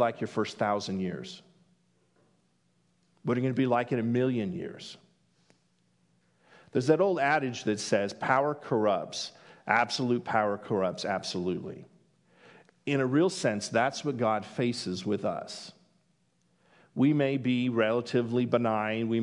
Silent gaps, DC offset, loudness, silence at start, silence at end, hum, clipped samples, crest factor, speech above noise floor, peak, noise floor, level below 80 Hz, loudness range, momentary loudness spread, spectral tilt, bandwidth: none; under 0.1%; -29 LUFS; 0 s; 0 s; none; under 0.1%; 22 dB; 43 dB; -8 dBFS; -71 dBFS; -78 dBFS; 5 LU; 14 LU; -5.5 dB/octave; 11 kHz